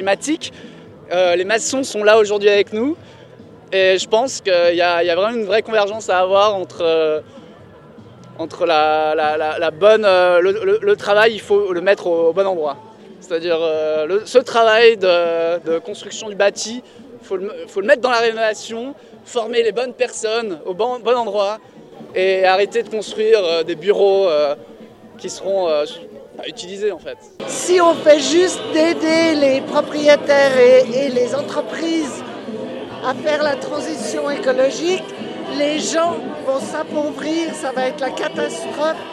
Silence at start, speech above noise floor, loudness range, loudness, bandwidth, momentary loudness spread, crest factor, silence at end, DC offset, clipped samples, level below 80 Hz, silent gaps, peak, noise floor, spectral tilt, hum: 0 s; 25 dB; 6 LU; -17 LUFS; 12.5 kHz; 14 LU; 18 dB; 0 s; under 0.1%; under 0.1%; -64 dBFS; none; 0 dBFS; -41 dBFS; -3 dB/octave; none